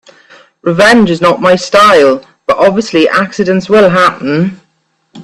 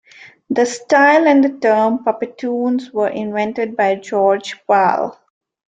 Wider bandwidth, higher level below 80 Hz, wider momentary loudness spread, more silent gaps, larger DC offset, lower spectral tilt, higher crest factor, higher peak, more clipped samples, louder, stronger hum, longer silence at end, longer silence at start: first, 14 kHz vs 9.2 kHz; first, -46 dBFS vs -66 dBFS; about the same, 9 LU vs 10 LU; neither; neither; about the same, -5 dB/octave vs -5 dB/octave; about the same, 10 dB vs 14 dB; about the same, 0 dBFS vs -2 dBFS; first, 0.2% vs under 0.1%; first, -8 LUFS vs -16 LUFS; neither; second, 0 s vs 0.55 s; first, 0.65 s vs 0.2 s